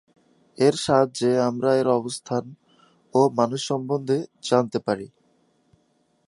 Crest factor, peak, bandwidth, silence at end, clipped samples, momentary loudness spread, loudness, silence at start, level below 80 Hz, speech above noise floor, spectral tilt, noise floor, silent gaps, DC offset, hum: 20 dB; -4 dBFS; 11.5 kHz; 1.2 s; under 0.1%; 8 LU; -23 LUFS; 0.6 s; -66 dBFS; 44 dB; -5.5 dB/octave; -66 dBFS; none; under 0.1%; none